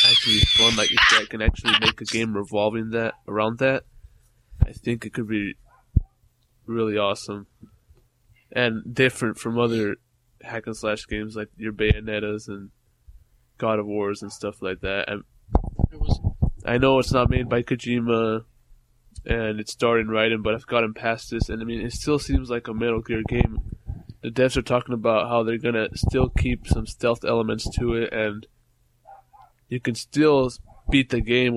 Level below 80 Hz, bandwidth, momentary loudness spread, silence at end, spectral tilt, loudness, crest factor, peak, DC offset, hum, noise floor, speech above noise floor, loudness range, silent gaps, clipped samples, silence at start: -34 dBFS; 13.5 kHz; 12 LU; 0 s; -4.5 dB/octave; -23 LUFS; 22 dB; 0 dBFS; under 0.1%; none; -63 dBFS; 40 dB; 6 LU; none; under 0.1%; 0 s